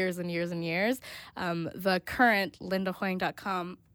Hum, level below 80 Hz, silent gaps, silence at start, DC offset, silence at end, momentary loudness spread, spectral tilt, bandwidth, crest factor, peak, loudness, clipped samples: none; -62 dBFS; none; 0 s; under 0.1%; 0.2 s; 10 LU; -5.5 dB/octave; 19.5 kHz; 20 dB; -10 dBFS; -30 LUFS; under 0.1%